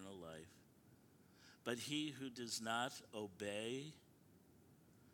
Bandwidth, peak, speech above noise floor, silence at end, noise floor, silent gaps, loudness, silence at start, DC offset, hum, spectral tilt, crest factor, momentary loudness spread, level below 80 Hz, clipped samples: 19 kHz; -28 dBFS; 23 dB; 0 s; -69 dBFS; none; -46 LUFS; 0 s; under 0.1%; none; -3.5 dB/octave; 22 dB; 22 LU; -84 dBFS; under 0.1%